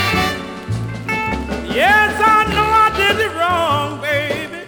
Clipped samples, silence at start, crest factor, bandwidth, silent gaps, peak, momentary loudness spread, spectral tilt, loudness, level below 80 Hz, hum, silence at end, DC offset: under 0.1%; 0 s; 14 dB; over 20 kHz; none; -2 dBFS; 11 LU; -4.5 dB/octave; -15 LUFS; -36 dBFS; none; 0 s; under 0.1%